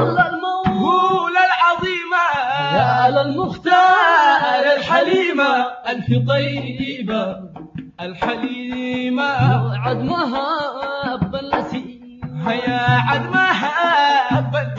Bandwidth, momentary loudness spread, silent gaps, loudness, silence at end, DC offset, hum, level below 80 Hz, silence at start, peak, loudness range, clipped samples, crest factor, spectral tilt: 7.6 kHz; 11 LU; none; -17 LUFS; 0 s; under 0.1%; none; -50 dBFS; 0 s; -2 dBFS; 7 LU; under 0.1%; 16 dB; -6.5 dB/octave